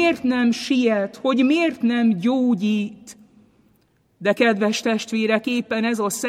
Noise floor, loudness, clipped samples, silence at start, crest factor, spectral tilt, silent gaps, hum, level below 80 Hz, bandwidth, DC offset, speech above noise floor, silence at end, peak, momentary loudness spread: -62 dBFS; -20 LUFS; under 0.1%; 0 s; 16 dB; -4.5 dB/octave; none; none; -66 dBFS; 15.5 kHz; under 0.1%; 42 dB; 0 s; -6 dBFS; 5 LU